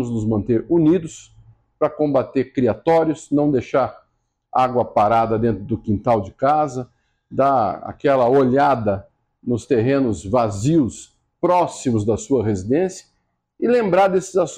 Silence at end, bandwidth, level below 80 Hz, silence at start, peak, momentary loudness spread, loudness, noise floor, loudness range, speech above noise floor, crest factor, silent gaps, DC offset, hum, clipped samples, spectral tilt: 0 s; 10 kHz; -48 dBFS; 0 s; -4 dBFS; 9 LU; -19 LUFS; -69 dBFS; 2 LU; 51 dB; 14 dB; none; under 0.1%; none; under 0.1%; -7 dB/octave